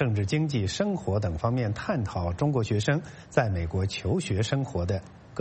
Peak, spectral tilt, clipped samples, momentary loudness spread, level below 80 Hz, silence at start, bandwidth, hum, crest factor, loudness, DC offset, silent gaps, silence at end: -8 dBFS; -6.5 dB/octave; under 0.1%; 4 LU; -46 dBFS; 0 s; 8.4 kHz; none; 20 dB; -28 LUFS; under 0.1%; none; 0 s